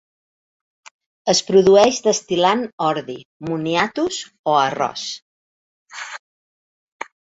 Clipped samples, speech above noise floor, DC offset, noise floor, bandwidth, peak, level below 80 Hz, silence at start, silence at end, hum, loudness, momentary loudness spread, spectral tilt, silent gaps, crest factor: under 0.1%; over 72 dB; under 0.1%; under -90 dBFS; 8 kHz; -2 dBFS; -60 dBFS; 1.25 s; 1.1 s; none; -18 LUFS; 21 LU; -3.5 dB/octave; 2.73-2.78 s, 3.25-3.40 s, 4.39-4.44 s, 5.22-5.86 s; 20 dB